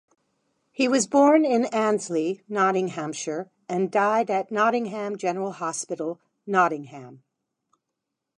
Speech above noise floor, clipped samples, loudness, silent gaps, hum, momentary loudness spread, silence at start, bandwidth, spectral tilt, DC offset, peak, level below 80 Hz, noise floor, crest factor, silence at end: 59 dB; under 0.1%; -24 LUFS; none; none; 13 LU; 0.8 s; 11.5 kHz; -4.5 dB/octave; under 0.1%; -6 dBFS; -78 dBFS; -83 dBFS; 18 dB; 1.2 s